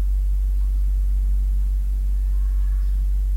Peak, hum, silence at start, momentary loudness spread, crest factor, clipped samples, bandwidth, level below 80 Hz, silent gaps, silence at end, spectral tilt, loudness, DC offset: -14 dBFS; none; 0 s; 1 LU; 4 dB; under 0.1%; 1.8 kHz; -20 dBFS; none; 0 s; -7.5 dB/octave; -24 LUFS; under 0.1%